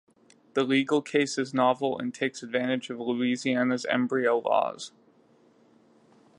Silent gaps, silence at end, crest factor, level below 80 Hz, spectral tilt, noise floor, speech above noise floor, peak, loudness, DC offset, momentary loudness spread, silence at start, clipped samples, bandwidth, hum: none; 1.5 s; 18 dB; -80 dBFS; -4.5 dB/octave; -61 dBFS; 34 dB; -10 dBFS; -27 LUFS; under 0.1%; 7 LU; 0.55 s; under 0.1%; 11 kHz; none